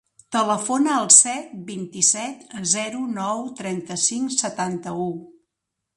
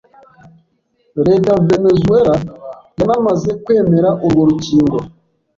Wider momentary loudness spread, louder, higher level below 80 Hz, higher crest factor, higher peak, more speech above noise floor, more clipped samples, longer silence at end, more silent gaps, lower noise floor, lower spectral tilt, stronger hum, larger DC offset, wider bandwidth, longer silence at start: first, 19 LU vs 15 LU; second, -20 LUFS vs -13 LUFS; second, -70 dBFS vs -42 dBFS; first, 22 dB vs 12 dB; about the same, 0 dBFS vs -2 dBFS; first, 59 dB vs 48 dB; neither; first, 0.65 s vs 0.5 s; neither; first, -82 dBFS vs -60 dBFS; second, -2 dB/octave vs -8 dB/octave; neither; neither; first, 11.5 kHz vs 7.6 kHz; second, 0.3 s vs 1.15 s